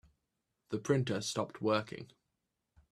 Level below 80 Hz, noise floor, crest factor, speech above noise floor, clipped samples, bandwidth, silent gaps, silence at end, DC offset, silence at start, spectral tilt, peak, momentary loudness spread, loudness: -74 dBFS; -86 dBFS; 22 dB; 51 dB; under 0.1%; 13.5 kHz; none; 0.85 s; under 0.1%; 0.7 s; -5 dB/octave; -14 dBFS; 15 LU; -35 LUFS